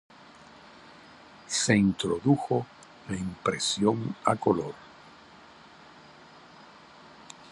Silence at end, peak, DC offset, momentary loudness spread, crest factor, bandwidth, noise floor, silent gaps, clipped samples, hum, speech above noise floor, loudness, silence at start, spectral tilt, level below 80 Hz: 0 s; -6 dBFS; under 0.1%; 26 LU; 24 dB; 11.5 kHz; -52 dBFS; none; under 0.1%; none; 26 dB; -27 LUFS; 0.85 s; -4.5 dB/octave; -60 dBFS